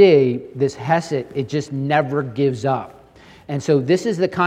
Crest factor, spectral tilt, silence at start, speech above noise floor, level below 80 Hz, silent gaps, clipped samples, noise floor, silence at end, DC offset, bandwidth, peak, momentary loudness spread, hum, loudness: 18 dB; -6.5 dB/octave; 0 s; 28 dB; -58 dBFS; none; under 0.1%; -46 dBFS; 0 s; under 0.1%; 10 kHz; 0 dBFS; 8 LU; none; -20 LUFS